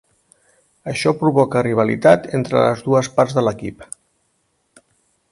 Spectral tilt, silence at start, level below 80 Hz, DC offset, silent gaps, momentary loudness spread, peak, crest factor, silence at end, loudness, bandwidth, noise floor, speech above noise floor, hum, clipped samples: -6 dB/octave; 0.85 s; -54 dBFS; under 0.1%; none; 18 LU; 0 dBFS; 18 dB; 1.5 s; -17 LUFS; 11.5 kHz; -66 dBFS; 50 dB; none; under 0.1%